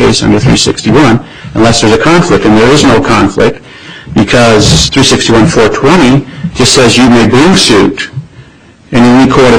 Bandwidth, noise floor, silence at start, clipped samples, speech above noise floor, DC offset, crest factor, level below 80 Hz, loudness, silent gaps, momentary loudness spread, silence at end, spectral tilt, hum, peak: 16 kHz; -36 dBFS; 0 s; 0.8%; 32 dB; 1%; 6 dB; -26 dBFS; -5 LUFS; none; 9 LU; 0 s; -4.5 dB/octave; none; 0 dBFS